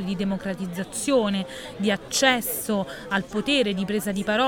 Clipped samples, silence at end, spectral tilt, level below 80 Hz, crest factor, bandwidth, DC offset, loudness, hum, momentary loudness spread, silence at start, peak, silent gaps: under 0.1%; 0 s; -3.5 dB/octave; -52 dBFS; 20 dB; 19 kHz; under 0.1%; -24 LUFS; none; 9 LU; 0 s; -4 dBFS; none